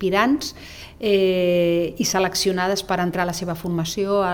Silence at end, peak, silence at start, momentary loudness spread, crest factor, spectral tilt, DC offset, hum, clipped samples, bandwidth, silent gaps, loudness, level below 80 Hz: 0 s; -4 dBFS; 0 s; 8 LU; 18 dB; -4.5 dB/octave; under 0.1%; none; under 0.1%; 19.5 kHz; none; -21 LUFS; -48 dBFS